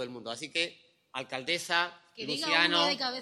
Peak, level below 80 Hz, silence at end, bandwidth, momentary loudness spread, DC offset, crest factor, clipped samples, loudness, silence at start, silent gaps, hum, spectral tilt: -8 dBFS; -78 dBFS; 0 s; 15 kHz; 15 LU; under 0.1%; 22 dB; under 0.1%; -29 LUFS; 0 s; none; none; -2 dB/octave